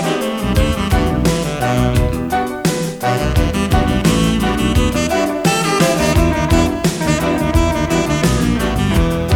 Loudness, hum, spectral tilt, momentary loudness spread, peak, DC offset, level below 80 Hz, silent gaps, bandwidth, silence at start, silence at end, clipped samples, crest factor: -16 LUFS; none; -5.5 dB/octave; 4 LU; 0 dBFS; under 0.1%; -22 dBFS; none; 18.5 kHz; 0 s; 0 s; under 0.1%; 14 dB